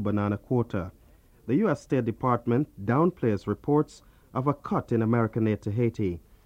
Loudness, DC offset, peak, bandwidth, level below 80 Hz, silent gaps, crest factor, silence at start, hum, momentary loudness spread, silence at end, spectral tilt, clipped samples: -27 LUFS; under 0.1%; -10 dBFS; 9.4 kHz; -54 dBFS; none; 18 dB; 0 s; none; 7 LU; 0.25 s; -9 dB/octave; under 0.1%